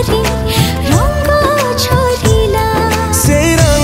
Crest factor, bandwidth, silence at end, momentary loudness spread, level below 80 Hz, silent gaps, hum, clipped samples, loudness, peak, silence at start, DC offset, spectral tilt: 10 dB; 16.5 kHz; 0 s; 3 LU; -20 dBFS; none; none; under 0.1%; -11 LUFS; 0 dBFS; 0 s; under 0.1%; -4.5 dB/octave